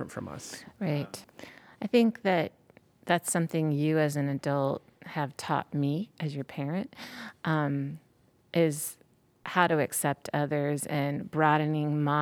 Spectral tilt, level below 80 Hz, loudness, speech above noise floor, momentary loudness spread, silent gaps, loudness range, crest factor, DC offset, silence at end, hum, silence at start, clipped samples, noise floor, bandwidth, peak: -5.5 dB/octave; -72 dBFS; -30 LUFS; 24 dB; 15 LU; none; 4 LU; 22 dB; under 0.1%; 0 s; none; 0 s; under 0.1%; -53 dBFS; 17.5 kHz; -8 dBFS